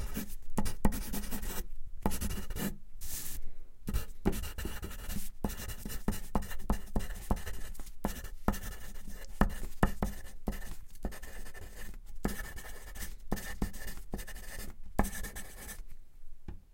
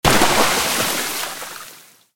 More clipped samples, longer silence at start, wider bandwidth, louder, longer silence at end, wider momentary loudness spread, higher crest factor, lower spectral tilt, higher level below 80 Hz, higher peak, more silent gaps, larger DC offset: neither; about the same, 0 s vs 0.05 s; about the same, 17 kHz vs 17 kHz; second, -40 LUFS vs -17 LUFS; second, 0 s vs 0.3 s; second, 14 LU vs 19 LU; first, 26 dB vs 20 dB; first, -5 dB/octave vs -2 dB/octave; about the same, -40 dBFS vs -38 dBFS; second, -8 dBFS vs 0 dBFS; neither; neither